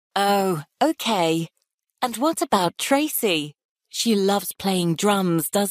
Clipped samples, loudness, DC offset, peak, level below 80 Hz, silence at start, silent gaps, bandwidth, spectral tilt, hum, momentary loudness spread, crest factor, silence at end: under 0.1%; -22 LUFS; under 0.1%; -6 dBFS; -66 dBFS; 0.15 s; 1.74-1.78 s, 3.65-3.75 s; 15.5 kHz; -4 dB/octave; none; 7 LU; 18 dB; 0 s